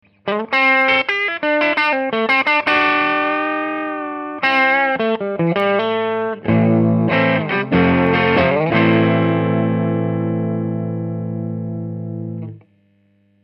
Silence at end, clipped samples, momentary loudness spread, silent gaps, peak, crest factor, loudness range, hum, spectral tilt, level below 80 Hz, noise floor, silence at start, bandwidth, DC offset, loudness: 0.85 s; under 0.1%; 11 LU; none; -2 dBFS; 16 dB; 6 LU; 50 Hz at -50 dBFS; -8 dB/octave; -52 dBFS; -58 dBFS; 0.25 s; 6.2 kHz; under 0.1%; -17 LUFS